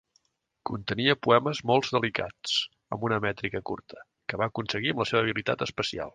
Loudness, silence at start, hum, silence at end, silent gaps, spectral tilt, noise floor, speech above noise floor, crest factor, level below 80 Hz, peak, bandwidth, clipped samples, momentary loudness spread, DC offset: -28 LUFS; 0.65 s; none; 0.05 s; none; -5 dB/octave; -71 dBFS; 43 dB; 22 dB; -60 dBFS; -6 dBFS; 9.6 kHz; under 0.1%; 12 LU; under 0.1%